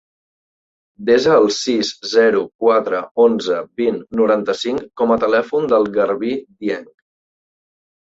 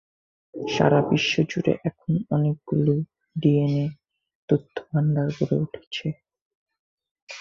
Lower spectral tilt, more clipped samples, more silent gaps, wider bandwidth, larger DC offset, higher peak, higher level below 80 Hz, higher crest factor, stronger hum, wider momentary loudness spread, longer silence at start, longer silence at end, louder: second, -4.5 dB/octave vs -7 dB/octave; neither; second, 2.55-2.59 s, 3.11-3.15 s vs 4.35-4.48 s, 5.87-5.91 s, 6.42-6.66 s, 6.79-6.97 s, 7.11-7.15 s, 7.22-7.27 s; first, 8 kHz vs 7.2 kHz; neither; about the same, -2 dBFS vs -4 dBFS; about the same, -58 dBFS vs -58 dBFS; about the same, 16 dB vs 20 dB; neither; about the same, 10 LU vs 12 LU; first, 1 s vs 0.55 s; first, 1.15 s vs 0 s; first, -17 LUFS vs -24 LUFS